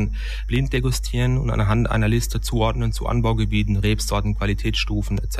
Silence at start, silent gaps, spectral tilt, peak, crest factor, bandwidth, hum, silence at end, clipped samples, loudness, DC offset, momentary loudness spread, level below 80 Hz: 0 s; none; -5.5 dB/octave; -6 dBFS; 14 dB; 14 kHz; none; 0 s; under 0.1%; -22 LUFS; 0.4%; 4 LU; -26 dBFS